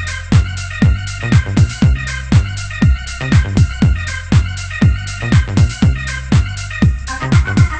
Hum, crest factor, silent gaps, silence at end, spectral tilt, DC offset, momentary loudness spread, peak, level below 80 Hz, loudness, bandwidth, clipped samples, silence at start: none; 14 dB; none; 0 s; -6 dB/octave; under 0.1%; 7 LU; 0 dBFS; -20 dBFS; -15 LUFS; 8.8 kHz; under 0.1%; 0 s